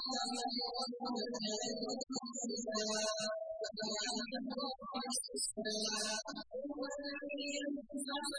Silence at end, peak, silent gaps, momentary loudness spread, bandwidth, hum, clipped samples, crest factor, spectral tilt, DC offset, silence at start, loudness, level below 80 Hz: 0 s; -26 dBFS; none; 6 LU; 10.5 kHz; none; under 0.1%; 16 dB; -1.5 dB/octave; under 0.1%; 0 s; -39 LUFS; -76 dBFS